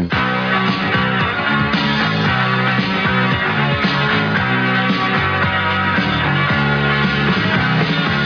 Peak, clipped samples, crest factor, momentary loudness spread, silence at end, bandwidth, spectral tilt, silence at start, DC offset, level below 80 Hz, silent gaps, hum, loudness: -4 dBFS; under 0.1%; 12 dB; 1 LU; 0 s; 5.4 kHz; -6.5 dB/octave; 0 s; under 0.1%; -40 dBFS; none; none; -15 LUFS